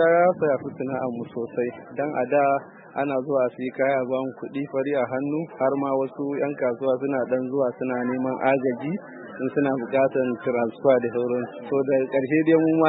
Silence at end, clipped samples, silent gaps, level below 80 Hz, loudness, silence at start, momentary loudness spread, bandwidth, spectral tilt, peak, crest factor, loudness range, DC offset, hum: 0 s; under 0.1%; none; -72 dBFS; -24 LUFS; 0 s; 9 LU; 4 kHz; -11.5 dB/octave; -6 dBFS; 18 dB; 2 LU; under 0.1%; none